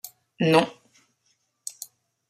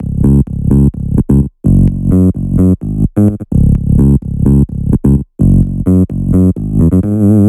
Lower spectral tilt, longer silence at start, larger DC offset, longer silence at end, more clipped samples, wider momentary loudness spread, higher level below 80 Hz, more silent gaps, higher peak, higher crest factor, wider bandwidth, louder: second, -5 dB/octave vs -11.5 dB/octave; about the same, 0.05 s vs 0 s; neither; first, 0.6 s vs 0 s; neither; first, 22 LU vs 3 LU; second, -70 dBFS vs -18 dBFS; neither; second, -4 dBFS vs 0 dBFS; first, 24 dB vs 10 dB; first, 15 kHz vs 12 kHz; second, -22 LUFS vs -11 LUFS